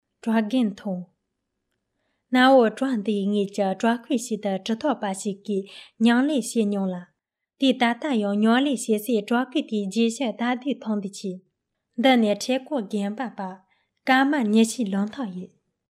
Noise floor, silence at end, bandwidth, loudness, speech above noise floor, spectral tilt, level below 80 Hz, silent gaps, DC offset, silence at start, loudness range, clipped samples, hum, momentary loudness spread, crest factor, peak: -79 dBFS; 0.45 s; 14.5 kHz; -23 LUFS; 56 dB; -5 dB/octave; -76 dBFS; none; under 0.1%; 0.25 s; 3 LU; under 0.1%; none; 13 LU; 18 dB; -6 dBFS